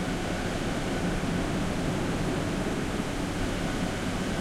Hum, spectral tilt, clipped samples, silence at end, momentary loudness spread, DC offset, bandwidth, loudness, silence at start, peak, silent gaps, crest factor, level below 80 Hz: none; -5.5 dB/octave; under 0.1%; 0 s; 1 LU; under 0.1%; 16 kHz; -30 LUFS; 0 s; -16 dBFS; none; 12 dB; -38 dBFS